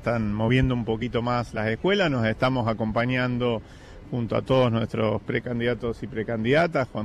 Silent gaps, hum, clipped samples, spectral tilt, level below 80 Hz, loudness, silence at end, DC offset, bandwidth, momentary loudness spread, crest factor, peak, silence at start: none; none; under 0.1%; -7.5 dB/octave; -44 dBFS; -25 LUFS; 0 s; under 0.1%; 10.5 kHz; 7 LU; 16 dB; -8 dBFS; 0 s